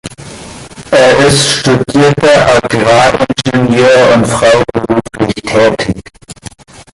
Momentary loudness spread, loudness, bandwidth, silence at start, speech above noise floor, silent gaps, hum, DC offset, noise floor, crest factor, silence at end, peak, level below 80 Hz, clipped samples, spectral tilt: 22 LU; -8 LUFS; 11.5 kHz; 0.05 s; 24 dB; none; none; under 0.1%; -31 dBFS; 10 dB; 0.1 s; 0 dBFS; -36 dBFS; under 0.1%; -4.5 dB/octave